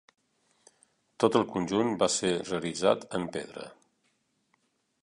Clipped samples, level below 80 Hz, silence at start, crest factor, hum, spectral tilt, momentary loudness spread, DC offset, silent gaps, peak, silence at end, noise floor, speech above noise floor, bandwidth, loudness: under 0.1%; -66 dBFS; 1.2 s; 22 dB; none; -4 dB/octave; 14 LU; under 0.1%; none; -8 dBFS; 1.3 s; -74 dBFS; 46 dB; 11.5 kHz; -29 LUFS